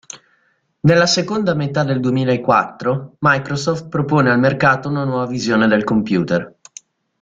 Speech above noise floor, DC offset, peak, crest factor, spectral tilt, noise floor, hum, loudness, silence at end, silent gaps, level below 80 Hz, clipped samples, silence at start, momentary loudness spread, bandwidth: 46 dB; under 0.1%; -2 dBFS; 16 dB; -5.5 dB/octave; -62 dBFS; none; -17 LUFS; 0.75 s; none; -52 dBFS; under 0.1%; 0.15 s; 8 LU; 7.8 kHz